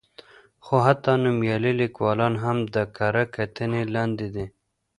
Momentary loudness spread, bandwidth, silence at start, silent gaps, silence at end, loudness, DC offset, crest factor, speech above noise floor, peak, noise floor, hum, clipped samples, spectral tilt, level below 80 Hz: 8 LU; 10.5 kHz; 0.65 s; none; 0.5 s; -24 LUFS; under 0.1%; 22 dB; 27 dB; -2 dBFS; -50 dBFS; none; under 0.1%; -8 dB/octave; -54 dBFS